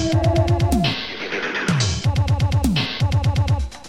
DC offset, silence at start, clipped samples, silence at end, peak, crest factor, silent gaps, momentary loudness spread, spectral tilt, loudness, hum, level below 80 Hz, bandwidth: under 0.1%; 0 s; under 0.1%; 0 s; -6 dBFS; 12 dB; none; 5 LU; -5.5 dB/octave; -20 LUFS; none; -30 dBFS; 15.5 kHz